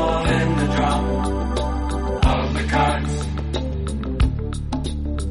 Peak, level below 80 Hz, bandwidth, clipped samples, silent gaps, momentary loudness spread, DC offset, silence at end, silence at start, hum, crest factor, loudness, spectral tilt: -6 dBFS; -24 dBFS; 11.5 kHz; under 0.1%; none; 7 LU; under 0.1%; 0 s; 0 s; none; 16 dB; -22 LUFS; -6 dB/octave